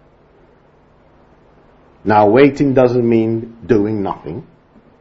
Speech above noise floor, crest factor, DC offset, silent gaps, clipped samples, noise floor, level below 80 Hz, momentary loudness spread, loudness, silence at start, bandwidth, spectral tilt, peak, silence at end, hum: 37 dB; 16 dB; under 0.1%; none; under 0.1%; -50 dBFS; -46 dBFS; 15 LU; -14 LUFS; 2.05 s; 7.6 kHz; -8.5 dB/octave; 0 dBFS; 0.6 s; none